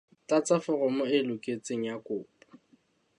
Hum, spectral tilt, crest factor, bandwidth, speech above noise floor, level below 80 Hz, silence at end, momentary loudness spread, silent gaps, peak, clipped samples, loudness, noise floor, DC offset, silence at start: none; -5 dB/octave; 18 dB; 11 kHz; 38 dB; -80 dBFS; 0.95 s; 10 LU; none; -12 dBFS; under 0.1%; -30 LUFS; -67 dBFS; under 0.1%; 0.3 s